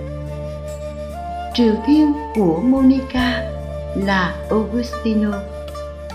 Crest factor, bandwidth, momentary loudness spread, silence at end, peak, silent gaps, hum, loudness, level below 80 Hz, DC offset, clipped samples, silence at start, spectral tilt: 14 dB; 13 kHz; 15 LU; 0 s; -4 dBFS; none; none; -19 LUFS; -34 dBFS; under 0.1%; under 0.1%; 0 s; -7 dB/octave